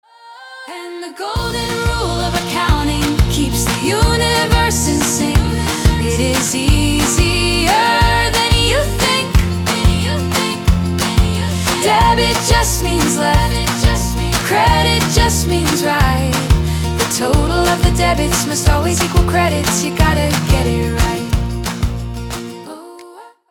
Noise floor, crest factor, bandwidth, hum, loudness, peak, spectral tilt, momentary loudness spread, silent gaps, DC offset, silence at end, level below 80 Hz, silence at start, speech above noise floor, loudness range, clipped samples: -38 dBFS; 14 dB; 18 kHz; none; -15 LUFS; 0 dBFS; -4 dB/octave; 8 LU; none; under 0.1%; 0.25 s; -22 dBFS; 0.25 s; 24 dB; 3 LU; under 0.1%